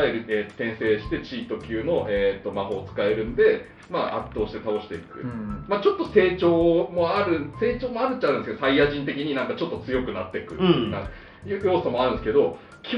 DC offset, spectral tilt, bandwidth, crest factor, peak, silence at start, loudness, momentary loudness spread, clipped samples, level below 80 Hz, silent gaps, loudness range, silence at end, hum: under 0.1%; -8 dB/octave; 6.2 kHz; 20 dB; -4 dBFS; 0 s; -24 LUFS; 11 LU; under 0.1%; -46 dBFS; none; 4 LU; 0 s; none